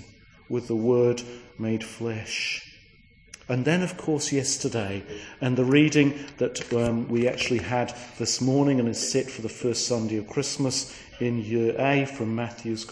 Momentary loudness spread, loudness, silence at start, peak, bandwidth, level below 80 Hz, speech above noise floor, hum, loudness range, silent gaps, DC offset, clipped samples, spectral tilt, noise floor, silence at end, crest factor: 11 LU; -26 LUFS; 0 s; -6 dBFS; 10.5 kHz; -56 dBFS; 29 dB; none; 4 LU; none; under 0.1%; under 0.1%; -4.5 dB/octave; -55 dBFS; 0 s; 20 dB